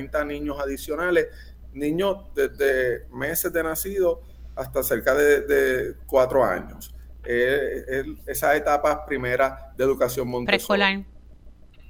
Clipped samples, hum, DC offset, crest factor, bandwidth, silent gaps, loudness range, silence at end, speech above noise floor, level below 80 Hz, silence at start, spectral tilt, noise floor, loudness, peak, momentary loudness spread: under 0.1%; none; under 0.1%; 22 dB; over 20 kHz; none; 3 LU; 0.1 s; 23 dB; -42 dBFS; 0 s; -4 dB/octave; -46 dBFS; -23 LUFS; -2 dBFS; 11 LU